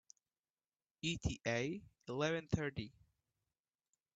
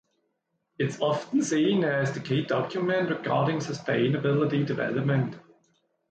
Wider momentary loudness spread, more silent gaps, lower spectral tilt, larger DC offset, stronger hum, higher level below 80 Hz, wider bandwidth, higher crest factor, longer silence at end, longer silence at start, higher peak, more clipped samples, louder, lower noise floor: first, 10 LU vs 5 LU; neither; about the same, -5 dB/octave vs -6 dB/octave; neither; neither; first, -60 dBFS vs -68 dBFS; about the same, 9 kHz vs 9 kHz; first, 22 dB vs 14 dB; first, 1.25 s vs 0.7 s; first, 1.05 s vs 0.8 s; second, -22 dBFS vs -12 dBFS; neither; second, -41 LUFS vs -27 LUFS; first, under -90 dBFS vs -77 dBFS